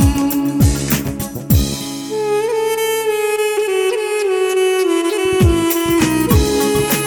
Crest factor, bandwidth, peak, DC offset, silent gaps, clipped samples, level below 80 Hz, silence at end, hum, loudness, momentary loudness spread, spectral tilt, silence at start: 14 dB; over 20 kHz; -2 dBFS; under 0.1%; none; under 0.1%; -26 dBFS; 0 s; none; -16 LUFS; 5 LU; -5 dB/octave; 0 s